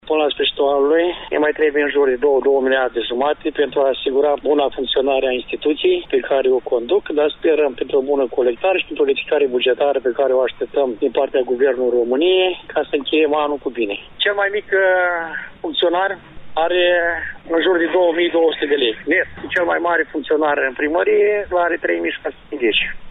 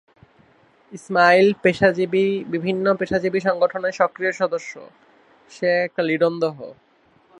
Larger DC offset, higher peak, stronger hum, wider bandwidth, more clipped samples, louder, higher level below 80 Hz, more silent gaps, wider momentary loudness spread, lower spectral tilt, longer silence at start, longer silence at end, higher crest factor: neither; second, -6 dBFS vs -2 dBFS; neither; second, 4 kHz vs 10.5 kHz; neither; about the same, -18 LUFS vs -20 LUFS; first, -48 dBFS vs -60 dBFS; neither; second, 5 LU vs 13 LU; about the same, -6.5 dB/octave vs -6 dB/octave; second, 0.05 s vs 0.9 s; second, 0 s vs 0.7 s; second, 12 dB vs 20 dB